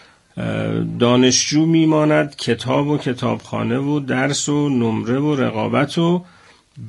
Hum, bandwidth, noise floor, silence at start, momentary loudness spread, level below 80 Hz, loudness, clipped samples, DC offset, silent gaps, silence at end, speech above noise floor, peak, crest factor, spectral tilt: none; 11.5 kHz; -40 dBFS; 0.35 s; 8 LU; -54 dBFS; -18 LUFS; under 0.1%; under 0.1%; none; 0 s; 23 dB; -2 dBFS; 16 dB; -5 dB/octave